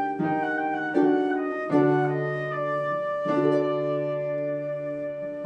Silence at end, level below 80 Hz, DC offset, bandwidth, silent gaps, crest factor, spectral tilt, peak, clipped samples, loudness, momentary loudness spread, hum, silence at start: 0 s; -68 dBFS; under 0.1%; 7 kHz; none; 18 dB; -8.5 dB/octave; -8 dBFS; under 0.1%; -26 LUFS; 8 LU; none; 0 s